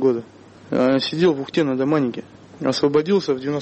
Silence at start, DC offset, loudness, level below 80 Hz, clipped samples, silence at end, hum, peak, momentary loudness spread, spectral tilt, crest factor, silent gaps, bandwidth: 0 s; under 0.1%; -20 LUFS; -62 dBFS; under 0.1%; 0 s; none; -8 dBFS; 8 LU; -6.5 dB/octave; 14 dB; none; 8.4 kHz